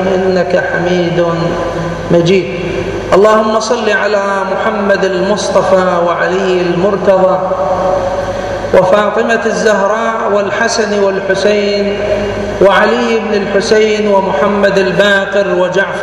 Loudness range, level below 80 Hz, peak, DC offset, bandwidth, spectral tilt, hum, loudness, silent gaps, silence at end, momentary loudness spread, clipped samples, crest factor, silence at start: 1 LU; -36 dBFS; 0 dBFS; under 0.1%; 11.5 kHz; -5 dB/octave; none; -11 LUFS; none; 0 s; 5 LU; 0.2%; 10 dB; 0 s